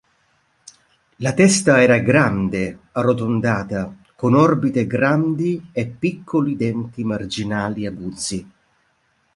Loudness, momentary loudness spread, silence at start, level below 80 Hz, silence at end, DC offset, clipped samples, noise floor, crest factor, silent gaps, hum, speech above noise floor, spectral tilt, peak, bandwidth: -19 LUFS; 13 LU; 1.2 s; -50 dBFS; 0.9 s; under 0.1%; under 0.1%; -64 dBFS; 18 dB; none; none; 46 dB; -5.5 dB/octave; -2 dBFS; 11.5 kHz